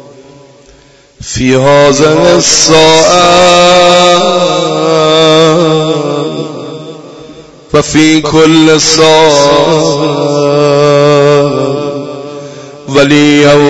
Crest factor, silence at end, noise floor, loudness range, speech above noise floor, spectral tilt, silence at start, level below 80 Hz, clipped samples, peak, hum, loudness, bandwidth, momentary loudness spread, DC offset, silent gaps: 6 dB; 0 s; -40 dBFS; 5 LU; 35 dB; -4 dB/octave; 1.2 s; -38 dBFS; 3%; 0 dBFS; none; -6 LUFS; 11 kHz; 16 LU; under 0.1%; none